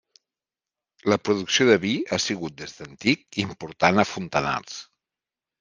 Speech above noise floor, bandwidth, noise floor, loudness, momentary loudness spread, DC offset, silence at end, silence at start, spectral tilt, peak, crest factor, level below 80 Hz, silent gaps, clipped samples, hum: over 66 dB; 10 kHz; under -90 dBFS; -23 LUFS; 15 LU; under 0.1%; 0.75 s; 1.05 s; -4 dB/octave; -2 dBFS; 22 dB; -60 dBFS; none; under 0.1%; none